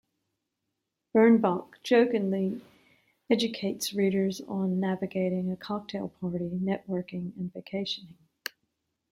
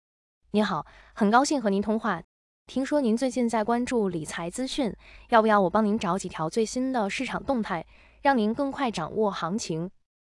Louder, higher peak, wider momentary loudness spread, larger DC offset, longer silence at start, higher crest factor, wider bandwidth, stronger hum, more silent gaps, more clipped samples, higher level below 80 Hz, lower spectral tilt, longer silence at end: second, -29 LUFS vs -26 LUFS; second, -10 dBFS vs -6 dBFS; first, 14 LU vs 10 LU; neither; first, 1.15 s vs 0.55 s; about the same, 20 dB vs 20 dB; first, 16 kHz vs 12 kHz; neither; second, none vs 2.24-2.66 s; neither; second, -70 dBFS vs -56 dBFS; about the same, -6 dB/octave vs -5 dB/octave; first, 1 s vs 0.4 s